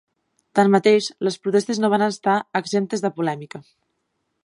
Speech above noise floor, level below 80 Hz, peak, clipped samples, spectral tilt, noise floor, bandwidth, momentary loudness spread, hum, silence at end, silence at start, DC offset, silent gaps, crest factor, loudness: 54 dB; -74 dBFS; -2 dBFS; under 0.1%; -5.5 dB/octave; -74 dBFS; 11.5 kHz; 10 LU; none; 0.85 s; 0.55 s; under 0.1%; none; 18 dB; -20 LUFS